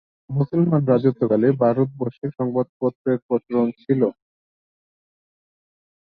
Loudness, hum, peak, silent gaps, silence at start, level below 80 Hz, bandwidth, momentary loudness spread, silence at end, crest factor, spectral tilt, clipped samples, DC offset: -21 LUFS; none; -4 dBFS; 2.69-2.80 s, 2.95-3.05 s, 3.22-3.29 s; 0.3 s; -62 dBFS; 4.8 kHz; 7 LU; 1.9 s; 18 dB; -12.5 dB/octave; under 0.1%; under 0.1%